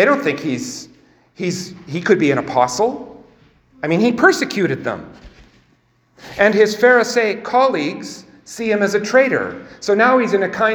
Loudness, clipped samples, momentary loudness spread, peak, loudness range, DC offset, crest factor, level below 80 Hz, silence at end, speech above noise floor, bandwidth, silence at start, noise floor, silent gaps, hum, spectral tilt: -16 LUFS; under 0.1%; 15 LU; 0 dBFS; 4 LU; under 0.1%; 18 dB; -56 dBFS; 0 s; 42 dB; over 20 kHz; 0 s; -58 dBFS; none; none; -4.5 dB/octave